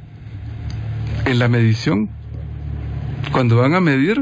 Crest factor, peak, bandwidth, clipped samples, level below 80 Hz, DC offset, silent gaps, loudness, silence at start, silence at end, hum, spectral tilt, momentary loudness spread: 14 dB; -4 dBFS; 7.8 kHz; under 0.1%; -34 dBFS; under 0.1%; none; -18 LUFS; 0 s; 0 s; none; -7.5 dB/octave; 16 LU